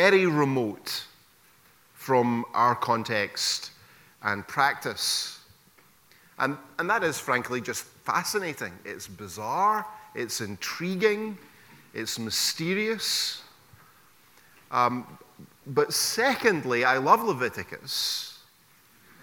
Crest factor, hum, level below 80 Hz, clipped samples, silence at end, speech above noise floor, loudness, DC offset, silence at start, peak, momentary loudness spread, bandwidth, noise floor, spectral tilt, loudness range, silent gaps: 24 dB; none; -70 dBFS; under 0.1%; 0.85 s; 33 dB; -26 LUFS; under 0.1%; 0 s; -4 dBFS; 14 LU; 19 kHz; -59 dBFS; -3 dB/octave; 5 LU; none